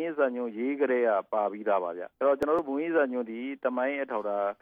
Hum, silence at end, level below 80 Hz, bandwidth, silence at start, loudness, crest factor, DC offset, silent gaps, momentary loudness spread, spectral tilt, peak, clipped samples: none; 0.1 s; -70 dBFS; 6.8 kHz; 0 s; -29 LUFS; 16 dB; under 0.1%; none; 6 LU; -7 dB/octave; -14 dBFS; under 0.1%